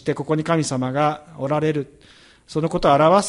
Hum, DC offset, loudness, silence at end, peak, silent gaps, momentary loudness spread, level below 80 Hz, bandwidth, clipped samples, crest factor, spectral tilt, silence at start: none; under 0.1%; -21 LUFS; 0 s; -4 dBFS; none; 12 LU; -50 dBFS; 11.5 kHz; under 0.1%; 16 dB; -6 dB/octave; 0.05 s